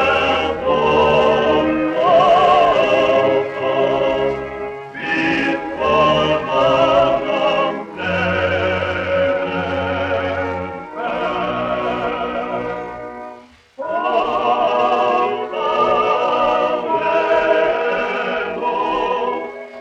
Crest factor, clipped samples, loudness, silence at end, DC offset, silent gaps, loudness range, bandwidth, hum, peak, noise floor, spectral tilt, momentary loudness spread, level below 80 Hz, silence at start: 14 dB; under 0.1%; -17 LUFS; 0 s; under 0.1%; none; 7 LU; 8.6 kHz; none; -4 dBFS; -41 dBFS; -5.5 dB/octave; 11 LU; -46 dBFS; 0 s